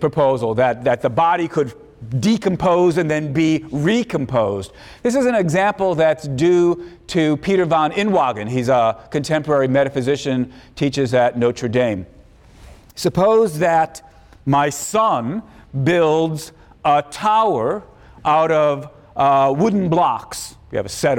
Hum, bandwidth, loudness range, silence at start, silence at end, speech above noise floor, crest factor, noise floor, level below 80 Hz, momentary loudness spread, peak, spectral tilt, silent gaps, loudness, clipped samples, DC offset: none; 17 kHz; 2 LU; 0 s; 0 s; 28 dB; 12 dB; -45 dBFS; -48 dBFS; 11 LU; -6 dBFS; -6 dB/octave; none; -18 LUFS; under 0.1%; under 0.1%